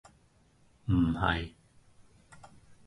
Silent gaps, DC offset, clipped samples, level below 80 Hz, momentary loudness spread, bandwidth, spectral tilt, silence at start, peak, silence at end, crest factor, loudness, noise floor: none; under 0.1%; under 0.1%; -46 dBFS; 16 LU; 11.5 kHz; -7.5 dB/octave; 0.85 s; -12 dBFS; 0.15 s; 22 dB; -30 LUFS; -65 dBFS